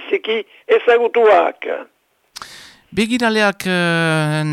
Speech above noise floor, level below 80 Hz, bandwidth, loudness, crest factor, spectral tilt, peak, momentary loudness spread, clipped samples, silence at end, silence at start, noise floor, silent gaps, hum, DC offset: 23 dB; -56 dBFS; 14.5 kHz; -16 LUFS; 14 dB; -5.5 dB/octave; -4 dBFS; 17 LU; under 0.1%; 0 s; 0 s; -38 dBFS; none; none; under 0.1%